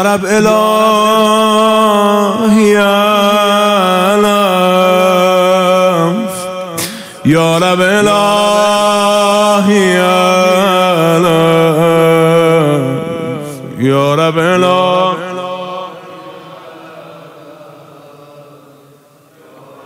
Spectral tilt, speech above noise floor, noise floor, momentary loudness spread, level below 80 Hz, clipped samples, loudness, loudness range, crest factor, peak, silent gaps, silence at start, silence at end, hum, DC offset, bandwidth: -5 dB/octave; 35 dB; -44 dBFS; 11 LU; -52 dBFS; under 0.1%; -10 LUFS; 6 LU; 10 dB; 0 dBFS; none; 0 s; 1.45 s; none; under 0.1%; 16 kHz